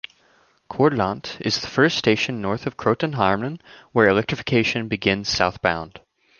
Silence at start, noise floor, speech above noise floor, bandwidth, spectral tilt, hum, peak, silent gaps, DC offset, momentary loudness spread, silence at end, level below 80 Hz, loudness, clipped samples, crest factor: 0.7 s; -59 dBFS; 38 dB; 7.2 kHz; -5 dB/octave; none; -2 dBFS; none; under 0.1%; 11 LU; 0.4 s; -50 dBFS; -21 LUFS; under 0.1%; 20 dB